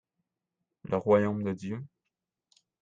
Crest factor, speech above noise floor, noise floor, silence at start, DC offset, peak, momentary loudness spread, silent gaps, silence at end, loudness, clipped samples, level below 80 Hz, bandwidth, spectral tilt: 22 dB; 59 dB; -86 dBFS; 0.85 s; under 0.1%; -10 dBFS; 22 LU; none; 0.95 s; -29 LUFS; under 0.1%; -70 dBFS; 7.6 kHz; -8.5 dB/octave